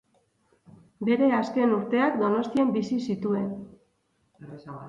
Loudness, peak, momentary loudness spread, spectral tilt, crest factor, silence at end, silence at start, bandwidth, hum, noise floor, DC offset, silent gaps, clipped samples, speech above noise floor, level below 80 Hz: -25 LUFS; -10 dBFS; 17 LU; -7.5 dB/octave; 16 dB; 0 s; 1 s; 7.6 kHz; none; -71 dBFS; under 0.1%; none; under 0.1%; 46 dB; -68 dBFS